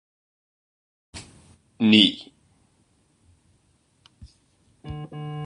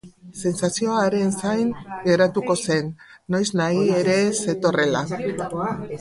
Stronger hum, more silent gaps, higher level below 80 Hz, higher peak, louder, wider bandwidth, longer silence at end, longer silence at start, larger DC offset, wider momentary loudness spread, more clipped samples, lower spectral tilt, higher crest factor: neither; neither; about the same, -56 dBFS vs -58 dBFS; first, -2 dBFS vs -6 dBFS; first, -19 LUFS vs -22 LUFS; about the same, 10.5 kHz vs 11.5 kHz; about the same, 0 s vs 0 s; first, 1.15 s vs 0.05 s; neither; first, 27 LU vs 8 LU; neither; about the same, -5 dB/octave vs -5 dB/octave; first, 26 dB vs 16 dB